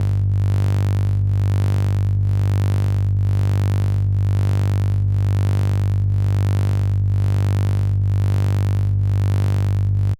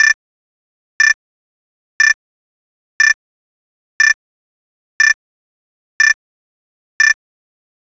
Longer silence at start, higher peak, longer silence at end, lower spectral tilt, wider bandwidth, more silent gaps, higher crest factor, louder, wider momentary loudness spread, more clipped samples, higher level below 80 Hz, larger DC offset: about the same, 0 s vs 0 s; second, -10 dBFS vs -2 dBFS; second, 0 s vs 0.85 s; first, -8 dB/octave vs 7 dB/octave; second, 7 kHz vs 8 kHz; second, none vs 0.14-1.00 s, 1.14-2.00 s, 2.14-3.00 s, 3.14-4.00 s, 4.14-5.00 s, 5.14-6.00 s, 6.14-7.00 s; second, 6 dB vs 16 dB; second, -19 LUFS vs -14 LUFS; second, 1 LU vs 7 LU; neither; first, -32 dBFS vs -82 dBFS; neither